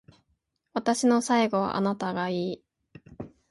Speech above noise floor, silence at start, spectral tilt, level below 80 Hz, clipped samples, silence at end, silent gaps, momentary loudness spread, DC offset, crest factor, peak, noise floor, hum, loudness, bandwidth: 50 dB; 0.75 s; -5 dB/octave; -64 dBFS; under 0.1%; 0.25 s; none; 20 LU; under 0.1%; 16 dB; -12 dBFS; -75 dBFS; none; -26 LUFS; 11.5 kHz